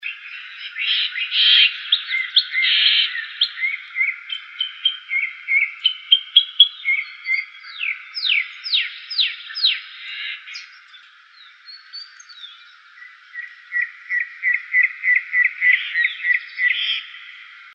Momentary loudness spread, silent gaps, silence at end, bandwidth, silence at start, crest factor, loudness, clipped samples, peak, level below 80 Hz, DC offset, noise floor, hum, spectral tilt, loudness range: 21 LU; none; 0.05 s; 8.8 kHz; 0 s; 22 dB; -18 LUFS; under 0.1%; 0 dBFS; under -90 dBFS; under 0.1%; -47 dBFS; none; 10.5 dB/octave; 14 LU